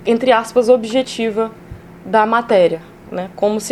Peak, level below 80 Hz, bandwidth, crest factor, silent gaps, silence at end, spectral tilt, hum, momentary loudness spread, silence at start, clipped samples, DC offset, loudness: 0 dBFS; -48 dBFS; 13 kHz; 16 dB; none; 0 s; -4.5 dB/octave; none; 13 LU; 0 s; under 0.1%; under 0.1%; -15 LUFS